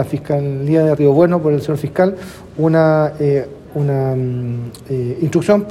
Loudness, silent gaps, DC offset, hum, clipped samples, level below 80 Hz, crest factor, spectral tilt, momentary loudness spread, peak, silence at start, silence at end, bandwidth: -16 LUFS; none; under 0.1%; none; under 0.1%; -48 dBFS; 14 dB; -8.5 dB/octave; 11 LU; 0 dBFS; 0 s; 0 s; 13.5 kHz